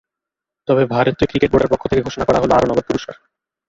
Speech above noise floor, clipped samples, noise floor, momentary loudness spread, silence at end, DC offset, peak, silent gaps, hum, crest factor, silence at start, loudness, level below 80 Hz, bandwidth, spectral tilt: 69 dB; under 0.1%; -85 dBFS; 9 LU; 0.55 s; under 0.1%; -2 dBFS; none; none; 16 dB; 0.7 s; -17 LUFS; -40 dBFS; 7.8 kHz; -6.5 dB/octave